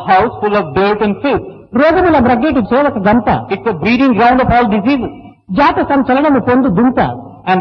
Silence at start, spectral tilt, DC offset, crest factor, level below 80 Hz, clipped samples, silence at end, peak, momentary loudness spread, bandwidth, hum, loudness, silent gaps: 0 s; -8.5 dB/octave; under 0.1%; 12 dB; -34 dBFS; under 0.1%; 0 s; 0 dBFS; 8 LU; 6.2 kHz; none; -12 LUFS; none